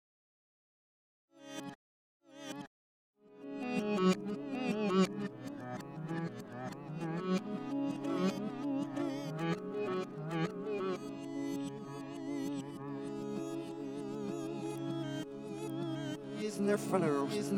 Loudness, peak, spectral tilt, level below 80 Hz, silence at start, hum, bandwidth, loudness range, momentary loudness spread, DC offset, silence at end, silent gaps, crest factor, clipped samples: -38 LUFS; -18 dBFS; -6.5 dB/octave; -78 dBFS; 1.35 s; none; 16.5 kHz; 5 LU; 13 LU; under 0.1%; 0 s; 1.75-2.20 s, 2.67-3.14 s; 20 dB; under 0.1%